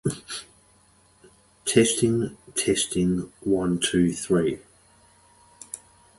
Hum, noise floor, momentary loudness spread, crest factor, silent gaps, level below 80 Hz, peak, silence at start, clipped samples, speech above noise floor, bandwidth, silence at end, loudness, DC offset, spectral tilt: none; -59 dBFS; 17 LU; 22 dB; none; -52 dBFS; -4 dBFS; 0.05 s; under 0.1%; 36 dB; 12 kHz; 0.4 s; -24 LUFS; under 0.1%; -4.5 dB/octave